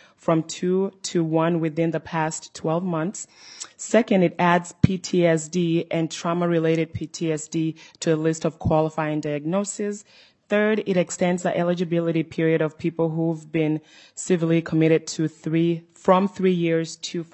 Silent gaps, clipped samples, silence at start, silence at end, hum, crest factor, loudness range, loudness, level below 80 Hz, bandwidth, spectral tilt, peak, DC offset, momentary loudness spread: none; under 0.1%; 0.3 s; 0.1 s; none; 22 dB; 3 LU; -23 LUFS; -56 dBFS; 8.6 kHz; -6 dB/octave; 0 dBFS; under 0.1%; 9 LU